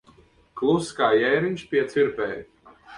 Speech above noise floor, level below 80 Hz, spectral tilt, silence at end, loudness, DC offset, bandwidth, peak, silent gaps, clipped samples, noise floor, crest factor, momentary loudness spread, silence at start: 33 dB; -60 dBFS; -5.5 dB/octave; 0 s; -23 LUFS; under 0.1%; 11 kHz; -8 dBFS; none; under 0.1%; -56 dBFS; 16 dB; 10 LU; 0.55 s